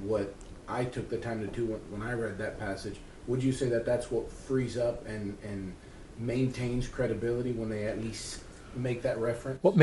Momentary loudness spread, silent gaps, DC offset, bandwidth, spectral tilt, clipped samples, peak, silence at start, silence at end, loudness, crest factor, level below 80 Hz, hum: 10 LU; none; under 0.1%; 11.5 kHz; -6.5 dB/octave; under 0.1%; -8 dBFS; 0 s; 0 s; -33 LUFS; 24 dB; -50 dBFS; none